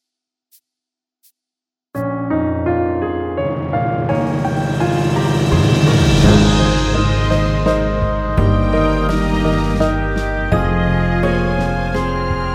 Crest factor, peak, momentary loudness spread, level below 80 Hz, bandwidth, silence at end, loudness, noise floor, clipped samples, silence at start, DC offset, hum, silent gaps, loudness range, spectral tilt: 16 dB; 0 dBFS; 7 LU; -24 dBFS; 13.5 kHz; 0 s; -16 LUFS; -87 dBFS; under 0.1%; 1.95 s; under 0.1%; none; none; 7 LU; -6.5 dB/octave